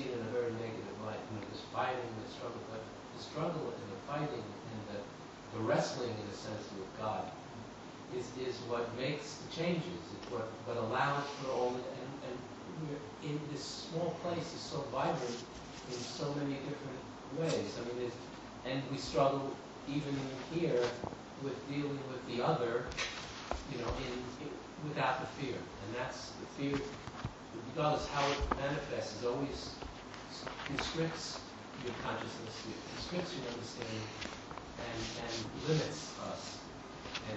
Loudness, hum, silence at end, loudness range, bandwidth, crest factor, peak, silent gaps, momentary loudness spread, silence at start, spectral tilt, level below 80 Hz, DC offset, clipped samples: -39 LUFS; none; 0 s; 4 LU; 8.2 kHz; 24 dB; -16 dBFS; none; 11 LU; 0 s; -5 dB/octave; -58 dBFS; under 0.1%; under 0.1%